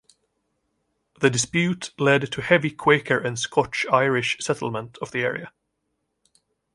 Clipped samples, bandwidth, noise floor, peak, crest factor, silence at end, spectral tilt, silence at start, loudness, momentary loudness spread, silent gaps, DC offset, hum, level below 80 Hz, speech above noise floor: under 0.1%; 11.5 kHz; -76 dBFS; -2 dBFS; 22 dB; 1.25 s; -4 dB/octave; 1.2 s; -22 LUFS; 7 LU; none; under 0.1%; none; -60 dBFS; 54 dB